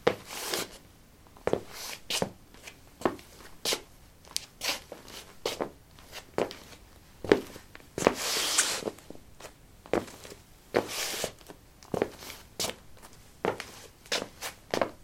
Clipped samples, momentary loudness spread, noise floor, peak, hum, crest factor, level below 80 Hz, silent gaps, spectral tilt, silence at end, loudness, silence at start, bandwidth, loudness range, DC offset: under 0.1%; 22 LU; -55 dBFS; -2 dBFS; none; 34 dB; -58 dBFS; none; -2.5 dB/octave; 0 s; -32 LUFS; 0 s; 16.5 kHz; 6 LU; under 0.1%